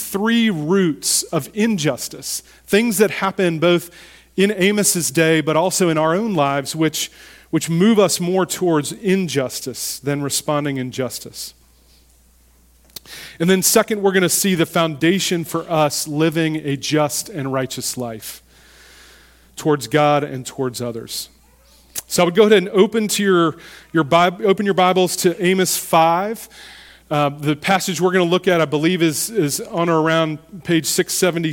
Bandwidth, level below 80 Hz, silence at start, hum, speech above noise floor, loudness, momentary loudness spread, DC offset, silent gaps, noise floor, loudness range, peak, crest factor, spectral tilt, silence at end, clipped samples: 17.5 kHz; -56 dBFS; 0 s; none; 35 dB; -18 LUFS; 12 LU; under 0.1%; none; -52 dBFS; 6 LU; 0 dBFS; 18 dB; -4 dB/octave; 0 s; under 0.1%